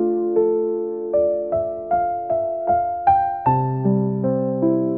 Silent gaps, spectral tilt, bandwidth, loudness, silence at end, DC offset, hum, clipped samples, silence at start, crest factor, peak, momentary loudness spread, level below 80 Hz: none; -11 dB/octave; 3.8 kHz; -20 LUFS; 0 s; 0.1%; none; under 0.1%; 0 s; 14 dB; -4 dBFS; 5 LU; -54 dBFS